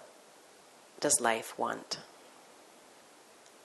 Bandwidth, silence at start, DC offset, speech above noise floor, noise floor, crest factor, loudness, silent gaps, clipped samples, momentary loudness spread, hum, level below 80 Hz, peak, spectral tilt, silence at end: 12 kHz; 0 s; under 0.1%; 26 dB; -58 dBFS; 24 dB; -32 LUFS; none; under 0.1%; 28 LU; none; -82 dBFS; -12 dBFS; -1 dB/octave; 1.35 s